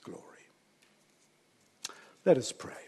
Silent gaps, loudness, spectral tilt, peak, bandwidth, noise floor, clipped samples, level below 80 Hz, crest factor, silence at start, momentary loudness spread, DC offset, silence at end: none; -32 LUFS; -4.5 dB/octave; -12 dBFS; 12.5 kHz; -68 dBFS; under 0.1%; -78 dBFS; 24 dB; 0.05 s; 21 LU; under 0.1%; 0.05 s